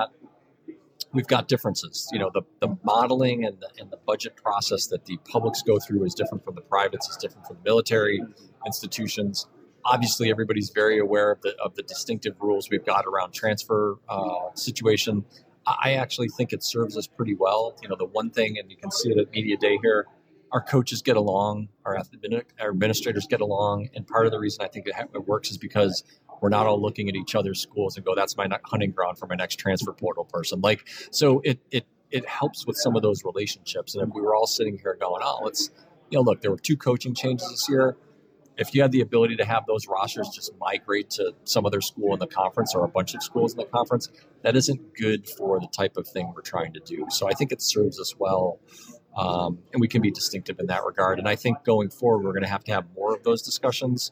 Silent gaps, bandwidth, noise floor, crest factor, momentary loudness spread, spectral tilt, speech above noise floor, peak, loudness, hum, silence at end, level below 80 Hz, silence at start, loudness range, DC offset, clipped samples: none; 16.5 kHz; -57 dBFS; 20 dB; 9 LU; -4.5 dB/octave; 32 dB; -6 dBFS; -25 LUFS; none; 0 s; -68 dBFS; 0 s; 2 LU; under 0.1%; under 0.1%